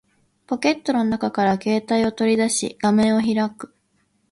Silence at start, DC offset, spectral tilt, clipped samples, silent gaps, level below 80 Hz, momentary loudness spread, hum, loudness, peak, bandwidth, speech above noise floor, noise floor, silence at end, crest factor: 0.5 s; under 0.1%; -4.5 dB/octave; under 0.1%; none; -56 dBFS; 8 LU; none; -20 LUFS; -6 dBFS; 11.5 kHz; 46 dB; -66 dBFS; 0.65 s; 16 dB